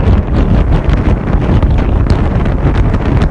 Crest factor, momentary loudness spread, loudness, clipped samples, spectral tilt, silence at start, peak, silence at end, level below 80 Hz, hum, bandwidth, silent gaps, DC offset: 10 dB; 2 LU; -12 LUFS; under 0.1%; -9 dB/octave; 0 s; 0 dBFS; 0 s; -12 dBFS; none; 7 kHz; none; under 0.1%